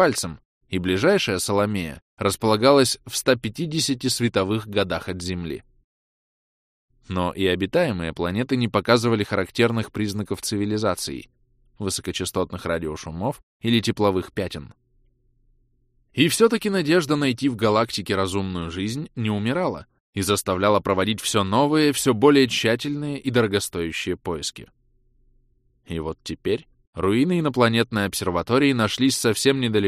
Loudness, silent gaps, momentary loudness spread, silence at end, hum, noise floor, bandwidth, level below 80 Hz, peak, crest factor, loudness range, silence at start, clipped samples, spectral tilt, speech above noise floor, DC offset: -22 LUFS; 0.45-0.61 s, 2.02-2.17 s, 5.84-6.88 s, 13.43-13.60 s, 20.00-20.13 s, 26.87-26.93 s; 11 LU; 0 s; none; -64 dBFS; 15.5 kHz; -50 dBFS; -2 dBFS; 20 dB; 7 LU; 0 s; under 0.1%; -4.5 dB/octave; 42 dB; under 0.1%